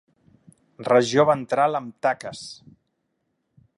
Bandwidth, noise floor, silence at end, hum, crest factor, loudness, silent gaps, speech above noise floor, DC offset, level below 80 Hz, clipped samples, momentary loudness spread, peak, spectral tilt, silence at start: 11.5 kHz; -75 dBFS; 1.25 s; none; 20 dB; -21 LUFS; none; 53 dB; under 0.1%; -68 dBFS; under 0.1%; 17 LU; -4 dBFS; -5 dB/octave; 0.8 s